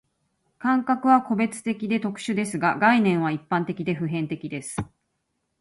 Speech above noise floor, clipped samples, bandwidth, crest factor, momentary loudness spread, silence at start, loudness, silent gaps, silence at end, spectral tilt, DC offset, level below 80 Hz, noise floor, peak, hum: 53 dB; under 0.1%; 11.5 kHz; 18 dB; 12 LU; 0.6 s; -24 LUFS; none; 0.75 s; -6 dB/octave; under 0.1%; -60 dBFS; -76 dBFS; -6 dBFS; none